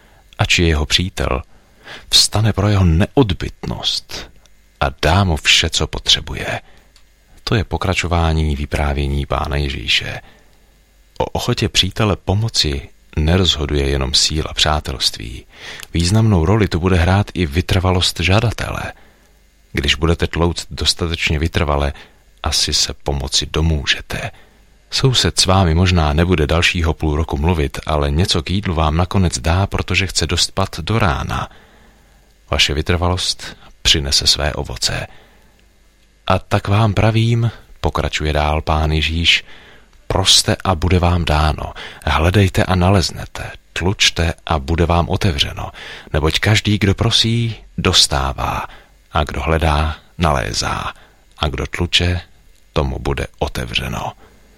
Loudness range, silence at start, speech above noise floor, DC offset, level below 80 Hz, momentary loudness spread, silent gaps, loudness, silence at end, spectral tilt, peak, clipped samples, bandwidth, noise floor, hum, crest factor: 4 LU; 0.4 s; 35 dB; under 0.1%; -26 dBFS; 11 LU; none; -16 LUFS; 0.45 s; -4 dB/octave; 0 dBFS; under 0.1%; 16 kHz; -51 dBFS; none; 18 dB